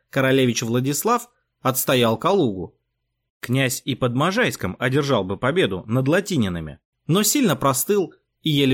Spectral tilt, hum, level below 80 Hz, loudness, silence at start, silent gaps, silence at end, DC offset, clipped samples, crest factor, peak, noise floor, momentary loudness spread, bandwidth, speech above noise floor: -4.5 dB/octave; none; -54 dBFS; -21 LUFS; 0.15 s; 3.30-3.40 s, 6.85-6.93 s; 0 s; under 0.1%; under 0.1%; 14 dB; -8 dBFS; -76 dBFS; 8 LU; 17 kHz; 56 dB